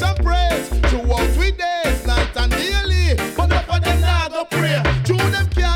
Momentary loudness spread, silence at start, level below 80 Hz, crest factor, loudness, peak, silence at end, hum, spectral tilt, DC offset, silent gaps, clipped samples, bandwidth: 2 LU; 0 s; -20 dBFS; 10 dB; -18 LUFS; -6 dBFS; 0 s; none; -5 dB/octave; under 0.1%; none; under 0.1%; 16.5 kHz